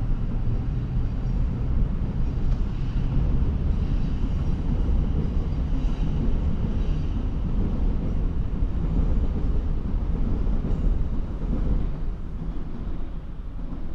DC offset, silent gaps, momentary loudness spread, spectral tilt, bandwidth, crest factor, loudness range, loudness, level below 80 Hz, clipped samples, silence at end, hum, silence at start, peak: under 0.1%; none; 8 LU; -9.5 dB/octave; 5 kHz; 12 dB; 3 LU; -28 LUFS; -24 dBFS; under 0.1%; 0 s; none; 0 s; -10 dBFS